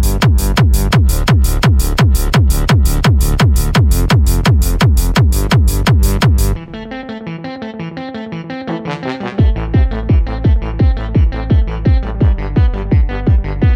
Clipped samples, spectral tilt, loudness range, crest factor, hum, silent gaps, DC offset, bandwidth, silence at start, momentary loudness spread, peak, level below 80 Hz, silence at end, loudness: under 0.1%; -6 dB/octave; 7 LU; 10 dB; none; none; under 0.1%; 17 kHz; 0 s; 13 LU; 0 dBFS; -14 dBFS; 0 s; -13 LUFS